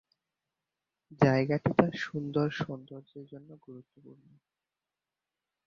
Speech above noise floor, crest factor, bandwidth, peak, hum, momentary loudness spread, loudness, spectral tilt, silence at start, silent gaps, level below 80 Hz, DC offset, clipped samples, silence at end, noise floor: over 59 dB; 28 dB; 7.2 kHz; -6 dBFS; none; 24 LU; -29 LUFS; -8 dB/octave; 1.1 s; none; -66 dBFS; under 0.1%; under 0.1%; 1.85 s; under -90 dBFS